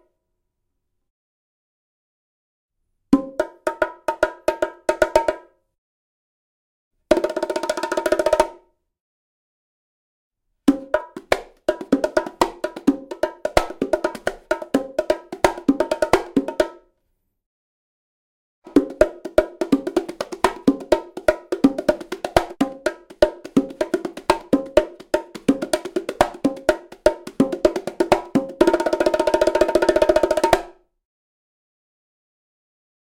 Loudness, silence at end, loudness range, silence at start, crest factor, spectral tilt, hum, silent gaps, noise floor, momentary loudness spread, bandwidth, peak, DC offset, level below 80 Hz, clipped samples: -21 LUFS; 2.3 s; 6 LU; 3.1 s; 22 dB; -5 dB/octave; none; 5.78-6.91 s, 9.00-10.31 s, 17.46-18.62 s; -75 dBFS; 7 LU; 17 kHz; 0 dBFS; under 0.1%; -44 dBFS; under 0.1%